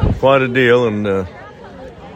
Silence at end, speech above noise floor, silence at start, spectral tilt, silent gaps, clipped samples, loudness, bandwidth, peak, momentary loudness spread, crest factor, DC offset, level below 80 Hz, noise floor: 0 s; 21 dB; 0 s; -7.5 dB/octave; none; under 0.1%; -14 LUFS; 14 kHz; 0 dBFS; 23 LU; 14 dB; under 0.1%; -30 dBFS; -34 dBFS